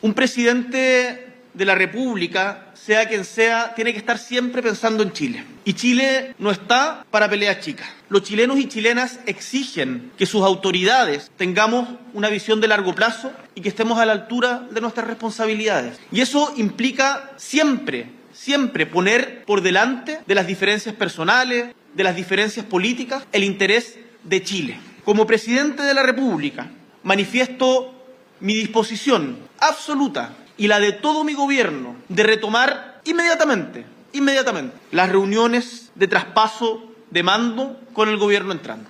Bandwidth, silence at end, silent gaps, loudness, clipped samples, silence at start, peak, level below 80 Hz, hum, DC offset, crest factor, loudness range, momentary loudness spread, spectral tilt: 13.5 kHz; 0.05 s; none; -19 LUFS; under 0.1%; 0.05 s; 0 dBFS; -70 dBFS; none; under 0.1%; 20 dB; 2 LU; 11 LU; -3.5 dB/octave